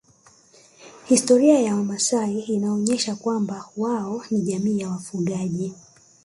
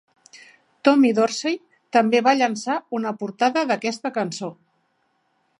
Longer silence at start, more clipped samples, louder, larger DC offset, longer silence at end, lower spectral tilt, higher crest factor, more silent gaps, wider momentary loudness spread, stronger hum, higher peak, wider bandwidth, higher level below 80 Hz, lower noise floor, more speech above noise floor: about the same, 0.8 s vs 0.85 s; neither; about the same, -22 LUFS vs -21 LUFS; neither; second, 0.5 s vs 1.05 s; about the same, -5 dB/octave vs -4.5 dB/octave; about the same, 18 dB vs 20 dB; neither; about the same, 11 LU vs 11 LU; neither; about the same, -4 dBFS vs -2 dBFS; about the same, 11.5 kHz vs 11 kHz; first, -66 dBFS vs -76 dBFS; second, -55 dBFS vs -68 dBFS; second, 33 dB vs 48 dB